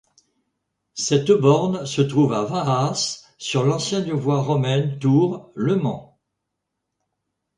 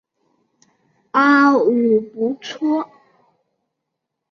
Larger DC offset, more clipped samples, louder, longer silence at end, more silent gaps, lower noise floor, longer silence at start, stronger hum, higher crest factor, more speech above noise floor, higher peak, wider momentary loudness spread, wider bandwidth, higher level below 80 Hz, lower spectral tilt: neither; neither; second, -21 LUFS vs -17 LUFS; about the same, 1.55 s vs 1.45 s; neither; about the same, -80 dBFS vs -79 dBFS; second, 0.95 s vs 1.15 s; neither; about the same, 18 dB vs 16 dB; about the same, 60 dB vs 63 dB; about the same, -2 dBFS vs -2 dBFS; about the same, 9 LU vs 11 LU; first, 11 kHz vs 7 kHz; first, -60 dBFS vs -68 dBFS; about the same, -6 dB/octave vs -5.5 dB/octave